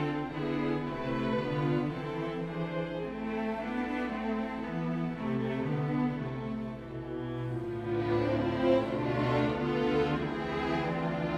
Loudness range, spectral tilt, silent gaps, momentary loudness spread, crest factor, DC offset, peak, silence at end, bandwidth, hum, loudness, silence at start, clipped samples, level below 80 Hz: 4 LU; -8 dB/octave; none; 7 LU; 18 dB; under 0.1%; -14 dBFS; 0 s; 10 kHz; none; -32 LUFS; 0 s; under 0.1%; -52 dBFS